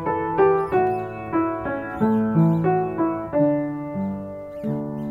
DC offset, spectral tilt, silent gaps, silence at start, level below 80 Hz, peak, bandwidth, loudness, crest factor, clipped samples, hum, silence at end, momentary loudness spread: under 0.1%; -10.5 dB/octave; none; 0 s; -50 dBFS; -6 dBFS; 4.2 kHz; -22 LUFS; 16 dB; under 0.1%; none; 0 s; 9 LU